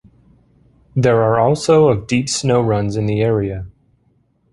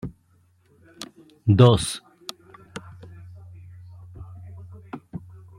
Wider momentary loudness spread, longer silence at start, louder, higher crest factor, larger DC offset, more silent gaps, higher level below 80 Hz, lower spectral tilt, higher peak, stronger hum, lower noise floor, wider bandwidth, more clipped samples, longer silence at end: second, 12 LU vs 29 LU; first, 0.95 s vs 0.05 s; first, -16 LUFS vs -19 LUFS; second, 16 dB vs 24 dB; neither; neither; first, -42 dBFS vs -52 dBFS; about the same, -6 dB/octave vs -6.5 dB/octave; about the same, -2 dBFS vs -2 dBFS; neither; about the same, -60 dBFS vs -61 dBFS; second, 11.5 kHz vs 13 kHz; neither; first, 0.85 s vs 0.4 s